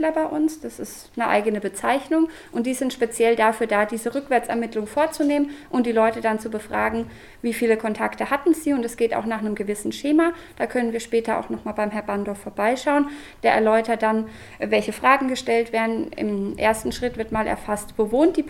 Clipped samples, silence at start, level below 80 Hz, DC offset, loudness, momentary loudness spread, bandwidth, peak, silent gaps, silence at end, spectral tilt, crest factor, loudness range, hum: under 0.1%; 0 s; -50 dBFS; under 0.1%; -23 LUFS; 8 LU; 17.5 kHz; -2 dBFS; none; 0 s; -4.5 dB/octave; 20 dB; 3 LU; none